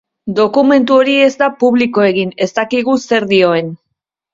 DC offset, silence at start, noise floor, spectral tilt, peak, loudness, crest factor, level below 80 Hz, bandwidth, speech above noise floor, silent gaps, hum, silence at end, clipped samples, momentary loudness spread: under 0.1%; 0.25 s; -74 dBFS; -5.5 dB/octave; 0 dBFS; -12 LUFS; 12 dB; -56 dBFS; 7.6 kHz; 62 dB; none; none; 0.6 s; under 0.1%; 7 LU